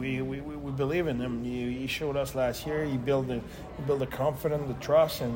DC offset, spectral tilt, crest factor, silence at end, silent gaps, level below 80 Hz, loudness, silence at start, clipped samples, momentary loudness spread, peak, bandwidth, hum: under 0.1%; -6.5 dB/octave; 18 dB; 0 s; none; -48 dBFS; -30 LUFS; 0 s; under 0.1%; 10 LU; -12 dBFS; 16.5 kHz; none